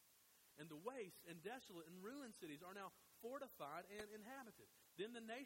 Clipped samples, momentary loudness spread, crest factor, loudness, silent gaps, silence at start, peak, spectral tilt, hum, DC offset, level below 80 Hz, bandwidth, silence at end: under 0.1%; 7 LU; 20 dB; -56 LUFS; none; 0 s; -36 dBFS; -4 dB/octave; none; under 0.1%; -88 dBFS; 16 kHz; 0 s